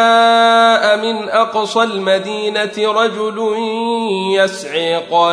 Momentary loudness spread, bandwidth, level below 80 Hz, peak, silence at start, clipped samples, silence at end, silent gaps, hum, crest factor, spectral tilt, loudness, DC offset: 8 LU; 11 kHz; -68 dBFS; -2 dBFS; 0 s; under 0.1%; 0 s; none; none; 12 dB; -3.5 dB/octave; -14 LUFS; under 0.1%